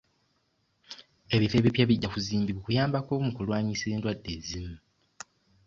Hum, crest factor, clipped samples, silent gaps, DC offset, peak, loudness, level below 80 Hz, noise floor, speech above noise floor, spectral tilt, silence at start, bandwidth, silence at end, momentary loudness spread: none; 22 dB; under 0.1%; none; under 0.1%; -8 dBFS; -28 LUFS; -52 dBFS; -73 dBFS; 45 dB; -6 dB/octave; 0.9 s; 7.8 kHz; 0.9 s; 23 LU